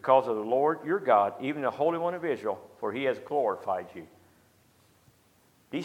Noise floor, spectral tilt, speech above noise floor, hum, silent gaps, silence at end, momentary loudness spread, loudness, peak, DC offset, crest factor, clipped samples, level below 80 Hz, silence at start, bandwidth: -64 dBFS; -6.5 dB/octave; 36 dB; none; none; 0 s; 11 LU; -29 LUFS; -8 dBFS; under 0.1%; 20 dB; under 0.1%; -78 dBFS; 0.05 s; 15.5 kHz